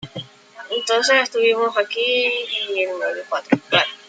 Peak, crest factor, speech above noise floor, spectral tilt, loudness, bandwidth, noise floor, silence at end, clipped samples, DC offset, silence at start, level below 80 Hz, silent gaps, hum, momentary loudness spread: -2 dBFS; 18 dB; 21 dB; -2.5 dB/octave; -19 LUFS; 9.2 kHz; -40 dBFS; 0.1 s; under 0.1%; under 0.1%; 0 s; -66 dBFS; none; none; 10 LU